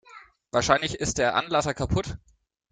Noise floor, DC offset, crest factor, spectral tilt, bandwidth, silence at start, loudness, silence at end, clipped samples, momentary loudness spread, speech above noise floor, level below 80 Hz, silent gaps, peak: -51 dBFS; under 0.1%; 22 dB; -4 dB/octave; 9.6 kHz; 0.1 s; -25 LUFS; 0.55 s; under 0.1%; 7 LU; 26 dB; -44 dBFS; none; -4 dBFS